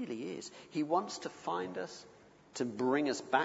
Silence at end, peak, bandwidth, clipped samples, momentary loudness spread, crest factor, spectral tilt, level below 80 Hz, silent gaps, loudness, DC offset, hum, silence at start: 0 s; -14 dBFS; 8 kHz; under 0.1%; 13 LU; 22 dB; -4.5 dB/octave; -80 dBFS; none; -37 LUFS; under 0.1%; none; 0 s